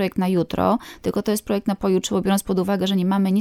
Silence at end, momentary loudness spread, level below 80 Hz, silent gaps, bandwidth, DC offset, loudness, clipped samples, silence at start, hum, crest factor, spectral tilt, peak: 0 s; 4 LU; -48 dBFS; none; 16 kHz; under 0.1%; -21 LUFS; under 0.1%; 0 s; none; 16 dB; -6 dB/octave; -6 dBFS